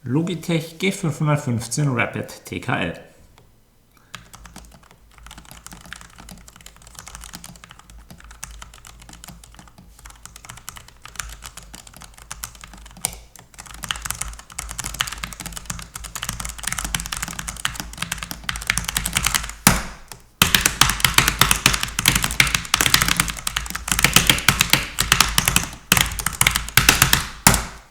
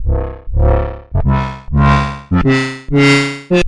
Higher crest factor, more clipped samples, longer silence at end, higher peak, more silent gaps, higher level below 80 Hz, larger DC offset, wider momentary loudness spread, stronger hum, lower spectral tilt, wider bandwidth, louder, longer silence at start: first, 24 dB vs 10 dB; neither; about the same, 0.1 s vs 0 s; first, 0 dBFS vs -4 dBFS; neither; second, -36 dBFS vs -20 dBFS; neither; first, 25 LU vs 9 LU; neither; second, -2 dB/octave vs -6.5 dB/octave; first, over 20 kHz vs 11 kHz; second, -19 LUFS vs -14 LUFS; about the same, 0.05 s vs 0 s